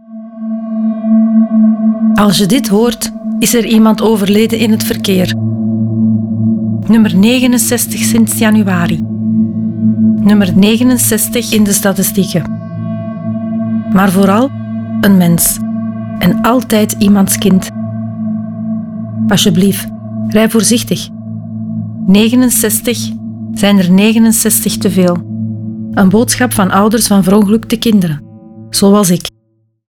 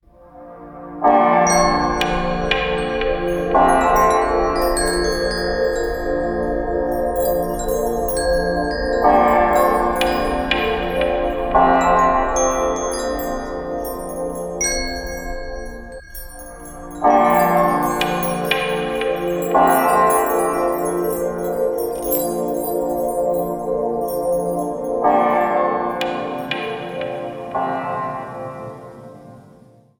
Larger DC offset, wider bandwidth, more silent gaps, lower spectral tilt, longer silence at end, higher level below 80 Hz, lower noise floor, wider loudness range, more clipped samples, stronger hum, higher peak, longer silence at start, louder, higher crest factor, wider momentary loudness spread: second, under 0.1% vs 0.1%; about the same, 19 kHz vs 19 kHz; neither; about the same, -5 dB/octave vs -4 dB/octave; first, 0.7 s vs 0.5 s; second, -40 dBFS vs -34 dBFS; first, -57 dBFS vs -48 dBFS; second, 3 LU vs 7 LU; neither; neither; about the same, 0 dBFS vs -2 dBFS; second, 0.1 s vs 0.35 s; first, -11 LUFS vs -19 LUFS; second, 10 dB vs 16 dB; about the same, 12 LU vs 14 LU